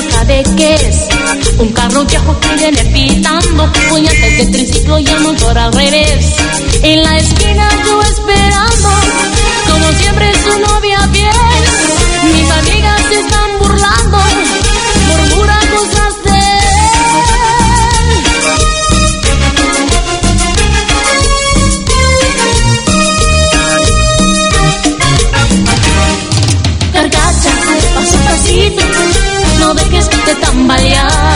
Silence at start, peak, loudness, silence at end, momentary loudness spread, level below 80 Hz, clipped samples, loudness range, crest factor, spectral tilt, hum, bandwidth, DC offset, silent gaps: 0 s; 0 dBFS; -8 LUFS; 0 s; 3 LU; -14 dBFS; 0.7%; 1 LU; 8 dB; -3.5 dB/octave; none; 11.5 kHz; under 0.1%; none